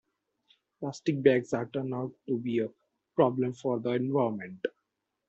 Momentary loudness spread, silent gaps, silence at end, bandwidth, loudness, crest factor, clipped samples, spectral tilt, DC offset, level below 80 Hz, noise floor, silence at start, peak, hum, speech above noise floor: 13 LU; none; 0.6 s; 8 kHz; -30 LUFS; 22 dB; under 0.1%; -7.5 dB/octave; under 0.1%; -72 dBFS; -83 dBFS; 0.8 s; -8 dBFS; none; 53 dB